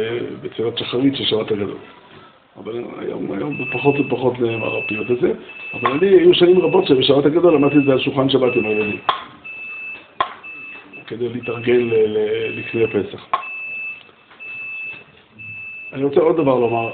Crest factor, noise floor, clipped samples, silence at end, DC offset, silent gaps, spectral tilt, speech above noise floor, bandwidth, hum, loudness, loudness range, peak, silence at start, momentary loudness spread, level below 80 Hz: 16 dB; -45 dBFS; under 0.1%; 0 s; under 0.1%; none; -4 dB/octave; 28 dB; 4.6 kHz; none; -18 LUFS; 9 LU; -2 dBFS; 0 s; 17 LU; -56 dBFS